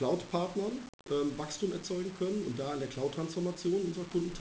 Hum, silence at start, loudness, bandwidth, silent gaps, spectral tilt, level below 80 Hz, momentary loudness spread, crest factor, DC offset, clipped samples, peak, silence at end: none; 0 s; -35 LUFS; 8 kHz; 0.89-0.99 s; -6 dB/octave; -62 dBFS; 4 LU; 16 dB; under 0.1%; under 0.1%; -18 dBFS; 0 s